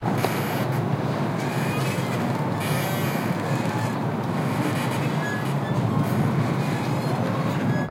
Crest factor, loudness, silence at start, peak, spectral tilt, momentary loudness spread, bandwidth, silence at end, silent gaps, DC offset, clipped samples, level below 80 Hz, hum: 18 dB; -25 LUFS; 0 s; -6 dBFS; -6.5 dB/octave; 2 LU; 16.5 kHz; 0 s; none; under 0.1%; under 0.1%; -56 dBFS; none